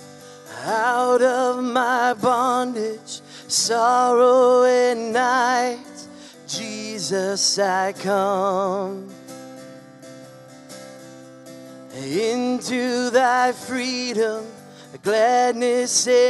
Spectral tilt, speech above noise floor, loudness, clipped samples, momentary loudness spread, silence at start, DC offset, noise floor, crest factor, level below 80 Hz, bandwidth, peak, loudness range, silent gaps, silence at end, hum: -2.5 dB/octave; 23 dB; -20 LUFS; under 0.1%; 22 LU; 0 s; under 0.1%; -43 dBFS; 16 dB; -74 dBFS; 12 kHz; -4 dBFS; 11 LU; none; 0 s; none